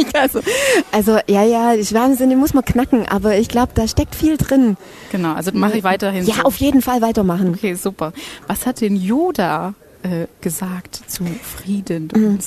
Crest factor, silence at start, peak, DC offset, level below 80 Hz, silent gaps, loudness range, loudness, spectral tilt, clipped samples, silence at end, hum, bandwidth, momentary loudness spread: 14 dB; 0 s; -2 dBFS; under 0.1%; -36 dBFS; none; 6 LU; -17 LUFS; -5.5 dB/octave; under 0.1%; 0 s; none; 14 kHz; 11 LU